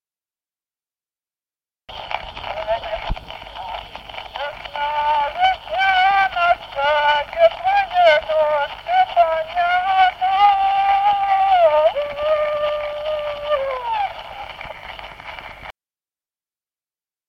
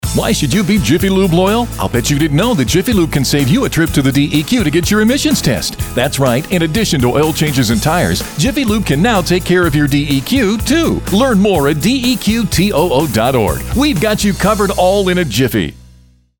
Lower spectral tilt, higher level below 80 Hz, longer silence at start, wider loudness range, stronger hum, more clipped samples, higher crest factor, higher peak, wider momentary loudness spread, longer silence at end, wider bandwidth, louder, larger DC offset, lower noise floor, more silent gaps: second, -3.5 dB/octave vs -5 dB/octave; second, -44 dBFS vs -28 dBFS; first, 1.9 s vs 0.05 s; first, 13 LU vs 1 LU; neither; neither; first, 18 dB vs 12 dB; about the same, -2 dBFS vs -2 dBFS; first, 18 LU vs 3 LU; first, 1.55 s vs 0.6 s; second, 7.2 kHz vs over 20 kHz; second, -18 LUFS vs -13 LUFS; neither; first, under -90 dBFS vs -45 dBFS; neither